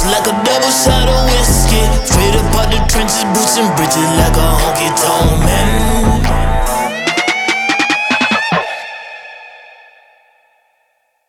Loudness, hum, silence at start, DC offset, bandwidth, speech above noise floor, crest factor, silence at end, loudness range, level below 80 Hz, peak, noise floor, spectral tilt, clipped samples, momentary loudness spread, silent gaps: -12 LUFS; none; 0 s; under 0.1%; 17 kHz; 50 dB; 12 dB; 1.7 s; 4 LU; -18 dBFS; 0 dBFS; -61 dBFS; -3.5 dB/octave; under 0.1%; 5 LU; none